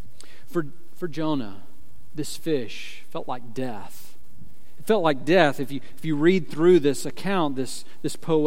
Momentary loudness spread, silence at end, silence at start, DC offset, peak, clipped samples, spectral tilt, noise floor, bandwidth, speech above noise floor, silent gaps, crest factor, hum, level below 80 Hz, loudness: 17 LU; 0 s; 0.5 s; 5%; -2 dBFS; under 0.1%; -5.5 dB/octave; -52 dBFS; 16.5 kHz; 27 dB; none; 22 dB; none; -62 dBFS; -25 LUFS